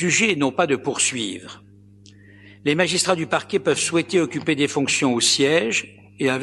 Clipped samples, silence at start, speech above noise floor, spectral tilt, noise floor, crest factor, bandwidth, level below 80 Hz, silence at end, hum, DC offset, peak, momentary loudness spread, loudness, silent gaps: under 0.1%; 0 s; 27 dB; -3 dB/octave; -48 dBFS; 20 dB; 12 kHz; -64 dBFS; 0 s; 50 Hz at -50 dBFS; under 0.1%; -2 dBFS; 10 LU; -20 LUFS; none